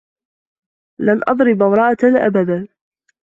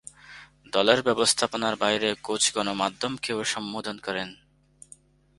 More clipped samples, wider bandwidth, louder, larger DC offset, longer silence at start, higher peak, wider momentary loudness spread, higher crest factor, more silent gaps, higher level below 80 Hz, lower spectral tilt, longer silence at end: neither; second, 7.4 kHz vs 11.5 kHz; first, -15 LUFS vs -25 LUFS; neither; first, 1 s vs 0.25 s; about the same, -2 dBFS vs -2 dBFS; second, 8 LU vs 12 LU; second, 14 dB vs 26 dB; neither; about the same, -58 dBFS vs -62 dBFS; first, -9 dB/octave vs -2 dB/octave; second, 0.55 s vs 1.05 s